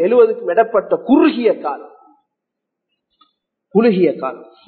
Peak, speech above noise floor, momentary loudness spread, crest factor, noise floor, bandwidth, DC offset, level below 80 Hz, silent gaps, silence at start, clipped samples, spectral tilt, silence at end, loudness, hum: 0 dBFS; 65 dB; 13 LU; 16 dB; -79 dBFS; 4.5 kHz; under 0.1%; -66 dBFS; none; 0 s; under 0.1%; -12 dB/octave; 0.25 s; -15 LUFS; none